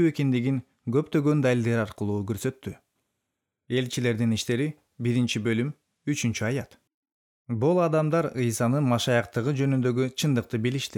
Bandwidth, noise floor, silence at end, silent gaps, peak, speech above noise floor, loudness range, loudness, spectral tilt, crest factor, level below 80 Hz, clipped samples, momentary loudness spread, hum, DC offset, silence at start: 17 kHz; -83 dBFS; 0 s; 6.94-7.03 s, 7.12-7.45 s; -10 dBFS; 58 dB; 4 LU; -26 LUFS; -6 dB/octave; 16 dB; -66 dBFS; under 0.1%; 9 LU; none; under 0.1%; 0 s